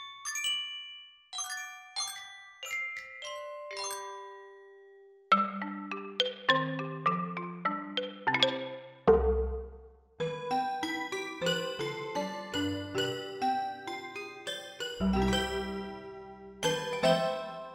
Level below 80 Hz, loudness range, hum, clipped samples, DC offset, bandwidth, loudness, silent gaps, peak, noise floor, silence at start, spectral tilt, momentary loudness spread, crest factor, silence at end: -48 dBFS; 7 LU; none; under 0.1%; under 0.1%; 16 kHz; -33 LUFS; none; -8 dBFS; -56 dBFS; 0 s; -3.5 dB/octave; 14 LU; 26 dB; 0 s